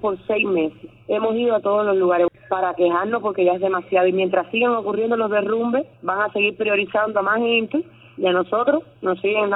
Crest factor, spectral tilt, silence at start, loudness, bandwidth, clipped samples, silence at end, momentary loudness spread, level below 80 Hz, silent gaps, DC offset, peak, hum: 14 dB; -8.5 dB/octave; 0 s; -20 LUFS; 4 kHz; under 0.1%; 0 s; 5 LU; -64 dBFS; none; under 0.1%; -6 dBFS; none